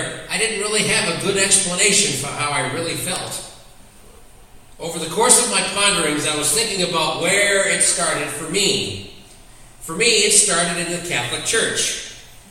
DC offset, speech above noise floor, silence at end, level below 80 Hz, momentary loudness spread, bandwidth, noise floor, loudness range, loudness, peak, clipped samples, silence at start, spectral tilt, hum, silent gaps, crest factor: under 0.1%; 25 dB; 0.15 s; -48 dBFS; 14 LU; 16.5 kHz; -43 dBFS; 4 LU; -17 LUFS; 0 dBFS; under 0.1%; 0 s; -1.5 dB/octave; none; none; 20 dB